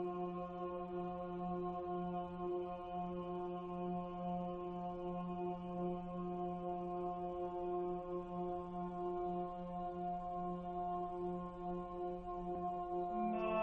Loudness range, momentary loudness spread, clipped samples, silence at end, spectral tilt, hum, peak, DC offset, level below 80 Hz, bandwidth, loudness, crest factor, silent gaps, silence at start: 1 LU; 3 LU; under 0.1%; 0 s; -10 dB/octave; none; -28 dBFS; under 0.1%; -62 dBFS; 4.2 kHz; -43 LUFS; 16 dB; none; 0 s